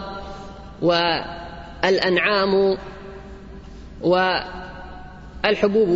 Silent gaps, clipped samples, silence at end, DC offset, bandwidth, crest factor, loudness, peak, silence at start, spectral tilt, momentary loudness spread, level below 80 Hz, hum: none; under 0.1%; 0 s; under 0.1%; 7.8 kHz; 18 dB; -20 LUFS; -4 dBFS; 0 s; -5.5 dB/octave; 22 LU; -42 dBFS; none